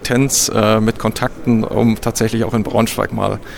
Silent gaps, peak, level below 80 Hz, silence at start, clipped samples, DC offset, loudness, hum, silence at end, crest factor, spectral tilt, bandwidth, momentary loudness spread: none; 0 dBFS; -36 dBFS; 0 s; under 0.1%; under 0.1%; -16 LUFS; none; 0 s; 16 dB; -4.5 dB/octave; 18 kHz; 6 LU